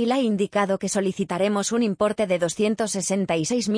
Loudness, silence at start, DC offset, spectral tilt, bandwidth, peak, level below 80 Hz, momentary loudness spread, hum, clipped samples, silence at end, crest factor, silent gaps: -23 LUFS; 0 s; under 0.1%; -4.5 dB/octave; 10.5 kHz; -10 dBFS; -62 dBFS; 2 LU; none; under 0.1%; 0 s; 14 dB; none